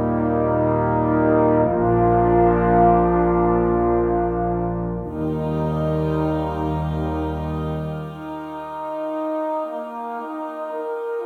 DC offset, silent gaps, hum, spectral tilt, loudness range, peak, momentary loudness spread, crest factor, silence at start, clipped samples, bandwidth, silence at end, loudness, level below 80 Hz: under 0.1%; none; none; -10.5 dB/octave; 10 LU; -4 dBFS; 13 LU; 16 dB; 0 s; under 0.1%; 4.5 kHz; 0 s; -21 LUFS; -36 dBFS